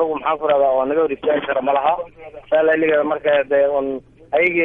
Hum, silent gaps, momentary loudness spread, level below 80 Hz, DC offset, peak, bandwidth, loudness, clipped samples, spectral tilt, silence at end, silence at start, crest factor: none; none; 7 LU; -54 dBFS; under 0.1%; -6 dBFS; 3.8 kHz; -18 LUFS; under 0.1%; -7.5 dB/octave; 0 s; 0 s; 12 dB